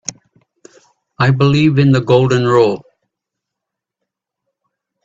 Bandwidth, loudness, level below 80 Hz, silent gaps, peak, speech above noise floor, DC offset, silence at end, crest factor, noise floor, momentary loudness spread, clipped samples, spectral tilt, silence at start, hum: 7.8 kHz; -12 LUFS; -50 dBFS; none; 0 dBFS; 70 dB; under 0.1%; 2.25 s; 16 dB; -81 dBFS; 7 LU; under 0.1%; -6.5 dB/octave; 0.1 s; none